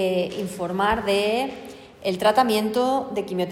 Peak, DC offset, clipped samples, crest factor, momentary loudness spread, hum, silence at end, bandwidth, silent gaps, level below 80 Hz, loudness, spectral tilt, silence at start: -6 dBFS; under 0.1%; under 0.1%; 18 dB; 11 LU; none; 0 s; 16.5 kHz; none; -50 dBFS; -23 LUFS; -5 dB/octave; 0 s